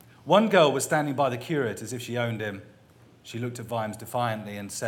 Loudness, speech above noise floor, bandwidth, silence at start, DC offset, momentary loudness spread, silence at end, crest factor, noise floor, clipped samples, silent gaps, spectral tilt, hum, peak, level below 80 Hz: -26 LUFS; 29 dB; 18 kHz; 0.25 s; under 0.1%; 15 LU; 0 s; 22 dB; -55 dBFS; under 0.1%; none; -5 dB/octave; none; -4 dBFS; -70 dBFS